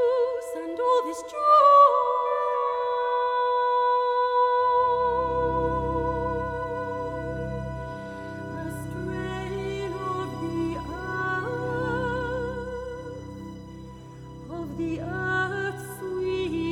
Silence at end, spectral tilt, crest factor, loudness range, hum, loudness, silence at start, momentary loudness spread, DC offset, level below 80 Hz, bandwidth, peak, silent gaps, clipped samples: 0 s; -6.5 dB/octave; 20 dB; 12 LU; none; -25 LUFS; 0 s; 15 LU; under 0.1%; -46 dBFS; 14.5 kHz; -6 dBFS; none; under 0.1%